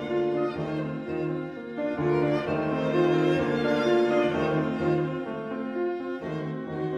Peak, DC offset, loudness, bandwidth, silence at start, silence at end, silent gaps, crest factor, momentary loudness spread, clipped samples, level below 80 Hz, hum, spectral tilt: -12 dBFS; under 0.1%; -27 LUFS; 7.6 kHz; 0 s; 0 s; none; 16 dB; 10 LU; under 0.1%; -56 dBFS; none; -7.5 dB/octave